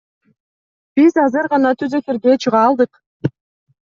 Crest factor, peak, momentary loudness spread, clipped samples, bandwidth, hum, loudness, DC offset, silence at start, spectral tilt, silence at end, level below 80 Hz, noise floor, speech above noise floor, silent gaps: 14 dB; -2 dBFS; 12 LU; under 0.1%; 7.4 kHz; none; -16 LUFS; under 0.1%; 0.95 s; -6.5 dB/octave; 0.55 s; -62 dBFS; under -90 dBFS; over 76 dB; 3.06-3.20 s